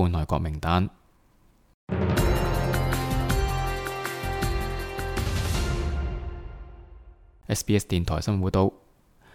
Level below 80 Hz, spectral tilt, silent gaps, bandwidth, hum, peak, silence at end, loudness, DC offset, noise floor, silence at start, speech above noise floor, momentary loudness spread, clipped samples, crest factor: -32 dBFS; -5.5 dB/octave; 1.74-1.87 s; 17.5 kHz; none; -8 dBFS; 0.6 s; -27 LUFS; under 0.1%; -60 dBFS; 0 s; 35 dB; 9 LU; under 0.1%; 18 dB